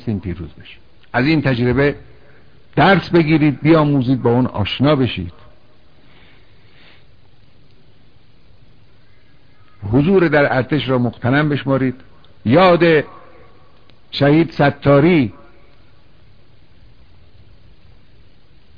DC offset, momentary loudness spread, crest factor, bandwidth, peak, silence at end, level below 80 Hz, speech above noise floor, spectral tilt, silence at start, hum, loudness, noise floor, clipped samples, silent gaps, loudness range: 0.9%; 15 LU; 16 dB; 5.4 kHz; -2 dBFS; 3.45 s; -44 dBFS; 37 dB; -9.5 dB/octave; 0.05 s; none; -15 LUFS; -51 dBFS; under 0.1%; none; 7 LU